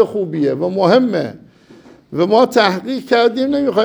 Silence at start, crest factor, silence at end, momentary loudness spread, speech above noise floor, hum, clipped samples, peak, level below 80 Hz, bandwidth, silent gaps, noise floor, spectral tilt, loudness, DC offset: 0 s; 14 dB; 0 s; 9 LU; 29 dB; none; under 0.1%; 0 dBFS; -60 dBFS; over 20 kHz; none; -43 dBFS; -6 dB/octave; -15 LUFS; under 0.1%